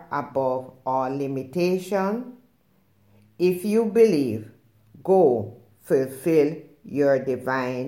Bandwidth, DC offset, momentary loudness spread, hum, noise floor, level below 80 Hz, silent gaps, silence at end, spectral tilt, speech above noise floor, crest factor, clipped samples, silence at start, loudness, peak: 17 kHz; under 0.1%; 13 LU; none; -63 dBFS; -70 dBFS; none; 0 s; -7 dB/octave; 41 dB; 18 dB; under 0.1%; 0 s; -23 LUFS; -6 dBFS